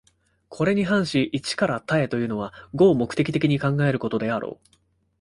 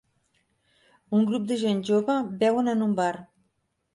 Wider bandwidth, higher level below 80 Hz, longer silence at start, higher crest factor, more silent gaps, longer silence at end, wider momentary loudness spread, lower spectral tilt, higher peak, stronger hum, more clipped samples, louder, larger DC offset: about the same, 11.5 kHz vs 11.5 kHz; first, -56 dBFS vs -72 dBFS; second, 0.5 s vs 1.1 s; about the same, 18 dB vs 14 dB; neither; about the same, 0.65 s vs 0.7 s; first, 9 LU vs 4 LU; about the same, -6.5 dB/octave vs -6.5 dB/octave; first, -6 dBFS vs -12 dBFS; neither; neither; about the same, -23 LUFS vs -25 LUFS; neither